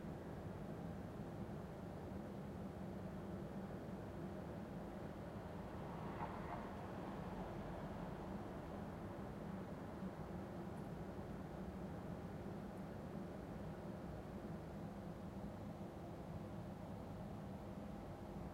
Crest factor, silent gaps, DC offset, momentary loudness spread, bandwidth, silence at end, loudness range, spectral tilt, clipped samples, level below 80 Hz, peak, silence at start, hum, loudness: 16 dB; none; under 0.1%; 2 LU; 16 kHz; 0 s; 2 LU; -8 dB/octave; under 0.1%; -62 dBFS; -34 dBFS; 0 s; none; -51 LUFS